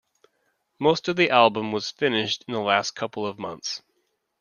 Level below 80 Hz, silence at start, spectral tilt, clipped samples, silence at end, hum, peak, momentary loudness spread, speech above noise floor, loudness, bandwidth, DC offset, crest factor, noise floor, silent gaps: -68 dBFS; 0.8 s; -4 dB/octave; under 0.1%; 0.6 s; none; -2 dBFS; 13 LU; 50 dB; -23 LUFS; 10 kHz; under 0.1%; 22 dB; -73 dBFS; none